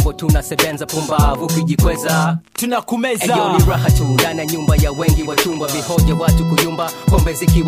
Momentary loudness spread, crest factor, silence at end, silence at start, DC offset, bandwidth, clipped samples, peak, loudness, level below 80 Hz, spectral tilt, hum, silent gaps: 5 LU; 14 dB; 0 s; 0 s; under 0.1%; 15.5 kHz; under 0.1%; 0 dBFS; -16 LUFS; -22 dBFS; -5 dB/octave; none; none